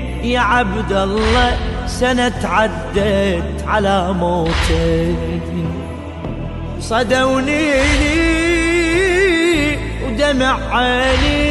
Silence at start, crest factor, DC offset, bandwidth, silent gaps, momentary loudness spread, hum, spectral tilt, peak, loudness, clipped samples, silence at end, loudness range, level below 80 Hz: 0 s; 14 dB; under 0.1%; 12 kHz; none; 9 LU; none; -5 dB/octave; -2 dBFS; -16 LUFS; under 0.1%; 0 s; 4 LU; -24 dBFS